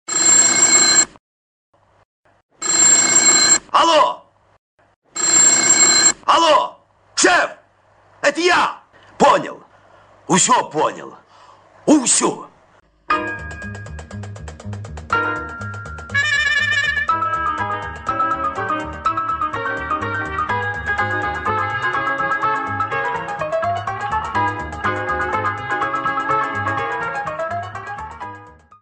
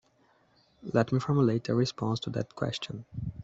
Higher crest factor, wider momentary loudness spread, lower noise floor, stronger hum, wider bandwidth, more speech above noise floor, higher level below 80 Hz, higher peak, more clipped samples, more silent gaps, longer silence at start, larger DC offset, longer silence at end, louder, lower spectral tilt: about the same, 18 dB vs 20 dB; first, 20 LU vs 12 LU; second, -54 dBFS vs -67 dBFS; neither; first, 11.5 kHz vs 8 kHz; about the same, 38 dB vs 37 dB; first, -46 dBFS vs -58 dBFS; first, 0 dBFS vs -10 dBFS; neither; first, 1.20-1.73 s, 2.05-2.24 s, 2.43-2.49 s, 4.59-4.78 s, 4.96-5.02 s vs none; second, 0.1 s vs 0.85 s; neither; first, 0.3 s vs 0 s; first, -16 LUFS vs -30 LUFS; second, -1.5 dB/octave vs -7 dB/octave